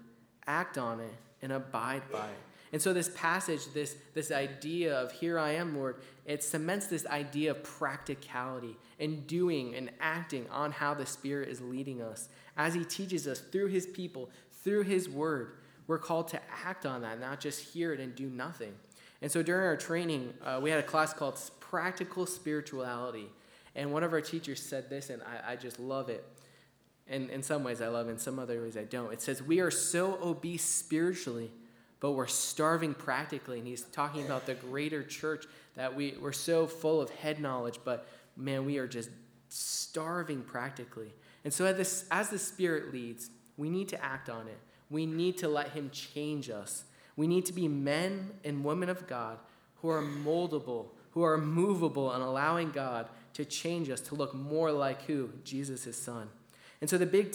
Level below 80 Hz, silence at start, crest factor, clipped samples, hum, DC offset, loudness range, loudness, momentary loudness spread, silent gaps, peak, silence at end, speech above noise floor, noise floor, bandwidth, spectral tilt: -80 dBFS; 0 s; 22 dB; under 0.1%; none; under 0.1%; 5 LU; -35 LUFS; 12 LU; none; -14 dBFS; 0 s; 32 dB; -66 dBFS; over 20 kHz; -4.5 dB/octave